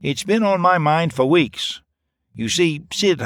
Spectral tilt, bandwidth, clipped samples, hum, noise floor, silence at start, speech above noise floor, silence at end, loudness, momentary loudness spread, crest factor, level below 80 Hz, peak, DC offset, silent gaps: -4.5 dB/octave; 16 kHz; under 0.1%; none; -72 dBFS; 0 s; 54 dB; 0 s; -18 LUFS; 10 LU; 16 dB; -56 dBFS; -2 dBFS; under 0.1%; none